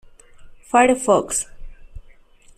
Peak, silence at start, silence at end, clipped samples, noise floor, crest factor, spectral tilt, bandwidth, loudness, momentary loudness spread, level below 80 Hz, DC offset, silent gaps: -4 dBFS; 0.4 s; 0.55 s; under 0.1%; -47 dBFS; 18 dB; -3.5 dB/octave; 15 kHz; -18 LUFS; 9 LU; -42 dBFS; under 0.1%; none